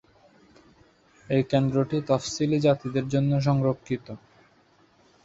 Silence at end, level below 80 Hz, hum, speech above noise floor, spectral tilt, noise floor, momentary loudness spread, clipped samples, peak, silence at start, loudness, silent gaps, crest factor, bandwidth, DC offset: 1.1 s; -58 dBFS; none; 37 dB; -7 dB/octave; -61 dBFS; 10 LU; under 0.1%; -8 dBFS; 1.3 s; -25 LUFS; none; 18 dB; 8 kHz; under 0.1%